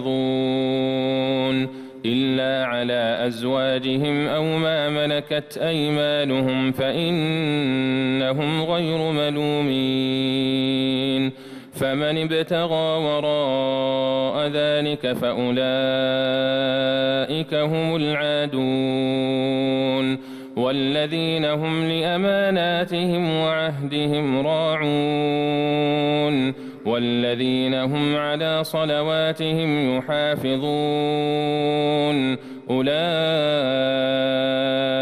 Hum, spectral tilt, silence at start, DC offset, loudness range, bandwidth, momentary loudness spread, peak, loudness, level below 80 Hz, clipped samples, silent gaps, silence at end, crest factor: none; -6.5 dB/octave; 0 s; under 0.1%; 1 LU; 15 kHz; 3 LU; -10 dBFS; -22 LUFS; -60 dBFS; under 0.1%; none; 0 s; 10 dB